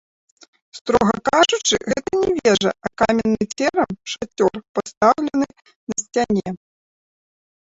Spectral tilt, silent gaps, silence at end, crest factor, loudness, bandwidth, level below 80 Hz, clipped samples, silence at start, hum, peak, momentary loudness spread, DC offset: -3.5 dB/octave; 0.81-0.85 s, 4.69-4.75 s, 4.97-5.01 s, 5.76-5.87 s; 1.15 s; 18 dB; -19 LUFS; 8.2 kHz; -50 dBFS; under 0.1%; 0.75 s; none; -2 dBFS; 11 LU; under 0.1%